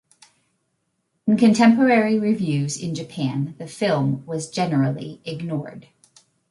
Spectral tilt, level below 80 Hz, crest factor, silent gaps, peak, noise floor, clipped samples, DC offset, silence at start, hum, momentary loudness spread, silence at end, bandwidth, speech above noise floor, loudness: -6 dB/octave; -64 dBFS; 18 dB; none; -4 dBFS; -73 dBFS; under 0.1%; under 0.1%; 1.25 s; none; 15 LU; 0.7 s; 11.5 kHz; 52 dB; -21 LUFS